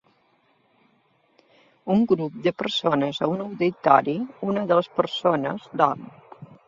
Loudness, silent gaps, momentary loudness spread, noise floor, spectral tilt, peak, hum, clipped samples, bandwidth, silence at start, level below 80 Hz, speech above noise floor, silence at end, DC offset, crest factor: -23 LUFS; none; 10 LU; -64 dBFS; -6.5 dB/octave; -2 dBFS; none; under 0.1%; 7.6 kHz; 1.85 s; -68 dBFS; 41 dB; 0.2 s; under 0.1%; 22 dB